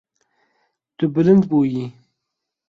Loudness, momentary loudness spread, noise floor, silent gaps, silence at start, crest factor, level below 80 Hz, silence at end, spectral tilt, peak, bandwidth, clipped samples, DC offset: -18 LUFS; 13 LU; -81 dBFS; none; 1 s; 18 dB; -60 dBFS; 0.8 s; -10 dB/octave; -2 dBFS; 6.4 kHz; under 0.1%; under 0.1%